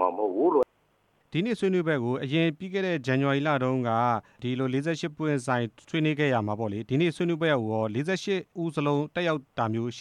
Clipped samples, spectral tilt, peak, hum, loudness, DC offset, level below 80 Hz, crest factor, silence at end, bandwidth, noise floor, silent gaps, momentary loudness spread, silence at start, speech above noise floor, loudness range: under 0.1%; -6.5 dB/octave; -10 dBFS; none; -27 LUFS; under 0.1%; -70 dBFS; 16 dB; 0 s; 11 kHz; -68 dBFS; none; 6 LU; 0 s; 41 dB; 1 LU